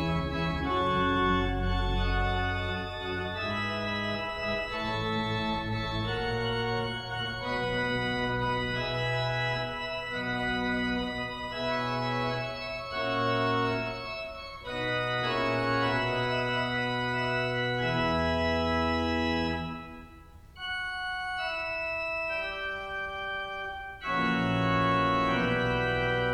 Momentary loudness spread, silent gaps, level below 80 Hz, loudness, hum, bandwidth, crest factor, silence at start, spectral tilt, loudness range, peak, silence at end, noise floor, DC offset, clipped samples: 7 LU; none; -44 dBFS; -30 LUFS; none; 13 kHz; 16 dB; 0 s; -6 dB/octave; 4 LU; -14 dBFS; 0 s; -50 dBFS; under 0.1%; under 0.1%